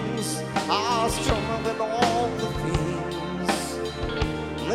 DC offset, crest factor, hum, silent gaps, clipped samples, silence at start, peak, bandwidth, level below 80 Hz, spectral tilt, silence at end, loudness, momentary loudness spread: under 0.1%; 18 dB; none; none; under 0.1%; 0 s; -6 dBFS; 16.5 kHz; -38 dBFS; -4.5 dB/octave; 0 s; -26 LUFS; 7 LU